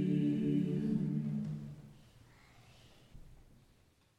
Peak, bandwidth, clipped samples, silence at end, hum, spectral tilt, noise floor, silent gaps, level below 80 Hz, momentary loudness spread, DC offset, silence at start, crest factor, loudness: -22 dBFS; 9 kHz; under 0.1%; 0.85 s; none; -9.5 dB/octave; -69 dBFS; none; -64 dBFS; 19 LU; under 0.1%; 0 s; 16 dB; -35 LUFS